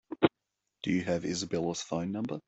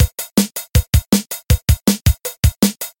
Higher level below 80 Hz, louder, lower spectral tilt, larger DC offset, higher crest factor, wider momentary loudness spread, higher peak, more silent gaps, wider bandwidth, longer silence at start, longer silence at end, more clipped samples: second, -64 dBFS vs -20 dBFS; second, -32 LUFS vs -17 LUFS; about the same, -5 dB/octave vs -5 dB/octave; neither; first, 22 dB vs 16 dB; about the same, 5 LU vs 3 LU; second, -10 dBFS vs 0 dBFS; neither; second, 8.2 kHz vs 17 kHz; about the same, 0.1 s vs 0 s; about the same, 0.05 s vs 0.1 s; neither